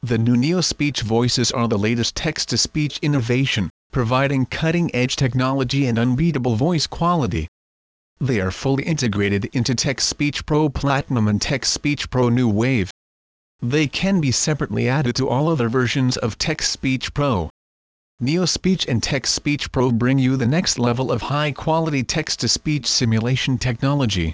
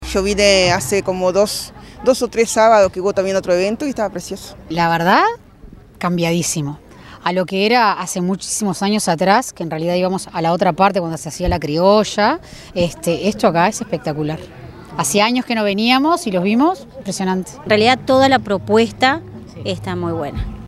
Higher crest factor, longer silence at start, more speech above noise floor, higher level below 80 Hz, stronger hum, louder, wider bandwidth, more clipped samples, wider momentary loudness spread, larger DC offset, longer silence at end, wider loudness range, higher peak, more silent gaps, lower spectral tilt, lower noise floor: about the same, 14 dB vs 16 dB; about the same, 0.05 s vs 0 s; first, over 71 dB vs 24 dB; about the same, -40 dBFS vs -40 dBFS; neither; second, -20 LUFS vs -16 LUFS; second, 8 kHz vs 15.5 kHz; neither; second, 4 LU vs 12 LU; neither; about the same, 0 s vs 0 s; about the same, 2 LU vs 3 LU; second, -6 dBFS vs 0 dBFS; first, 3.70-3.90 s, 7.48-8.16 s, 12.91-13.59 s, 17.50-18.18 s vs none; about the same, -5 dB/octave vs -4.5 dB/octave; first, under -90 dBFS vs -40 dBFS